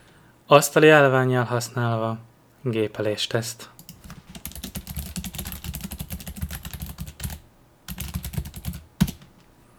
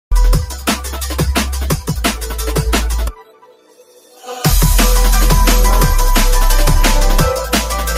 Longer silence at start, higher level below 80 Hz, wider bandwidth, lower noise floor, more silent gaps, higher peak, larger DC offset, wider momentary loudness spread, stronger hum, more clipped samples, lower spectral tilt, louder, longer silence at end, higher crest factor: first, 0.5 s vs 0.1 s; second, -42 dBFS vs -14 dBFS; first, over 20 kHz vs 16 kHz; first, -54 dBFS vs -45 dBFS; neither; about the same, 0 dBFS vs 0 dBFS; neither; first, 22 LU vs 8 LU; neither; neither; about the same, -5 dB/octave vs -4 dB/octave; second, -23 LUFS vs -15 LUFS; first, 0.6 s vs 0 s; first, 24 dB vs 12 dB